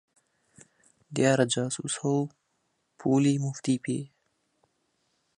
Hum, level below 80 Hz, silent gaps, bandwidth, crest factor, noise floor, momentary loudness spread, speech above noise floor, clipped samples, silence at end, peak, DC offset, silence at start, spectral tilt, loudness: none; -72 dBFS; none; 11 kHz; 22 dB; -75 dBFS; 12 LU; 49 dB; under 0.1%; 1.35 s; -8 dBFS; under 0.1%; 1.1 s; -5 dB/octave; -28 LUFS